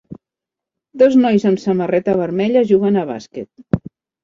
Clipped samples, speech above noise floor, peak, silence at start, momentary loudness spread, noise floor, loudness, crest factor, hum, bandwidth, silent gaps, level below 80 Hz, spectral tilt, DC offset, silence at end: under 0.1%; 71 dB; -2 dBFS; 0.1 s; 14 LU; -86 dBFS; -16 LUFS; 14 dB; none; 7.4 kHz; none; -48 dBFS; -8 dB/octave; under 0.1%; 0.45 s